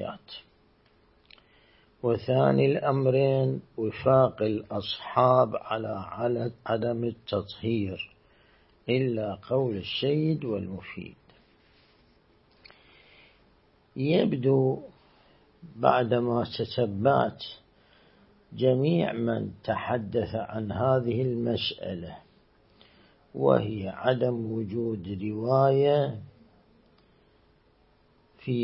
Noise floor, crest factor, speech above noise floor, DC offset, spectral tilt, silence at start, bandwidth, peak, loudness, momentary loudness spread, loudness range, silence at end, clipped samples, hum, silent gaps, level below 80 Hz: -63 dBFS; 24 dB; 37 dB; under 0.1%; -11 dB/octave; 0 s; 5.8 kHz; -4 dBFS; -27 LUFS; 15 LU; 6 LU; 0 s; under 0.1%; none; none; -62 dBFS